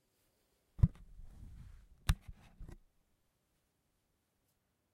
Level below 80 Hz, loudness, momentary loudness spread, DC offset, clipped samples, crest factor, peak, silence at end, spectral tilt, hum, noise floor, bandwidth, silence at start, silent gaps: -46 dBFS; -37 LUFS; 25 LU; under 0.1%; under 0.1%; 28 dB; -14 dBFS; 2.2 s; -6 dB/octave; none; -81 dBFS; 16 kHz; 0.8 s; none